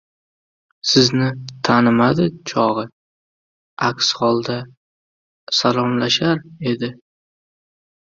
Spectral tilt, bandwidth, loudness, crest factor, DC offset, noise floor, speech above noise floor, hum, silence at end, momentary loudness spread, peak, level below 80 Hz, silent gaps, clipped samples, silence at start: -4.5 dB/octave; 7.6 kHz; -18 LUFS; 18 dB; under 0.1%; under -90 dBFS; over 72 dB; none; 1.05 s; 11 LU; -2 dBFS; -56 dBFS; 2.92-3.77 s, 4.77-5.47 s; under 0.1%; 0.85 s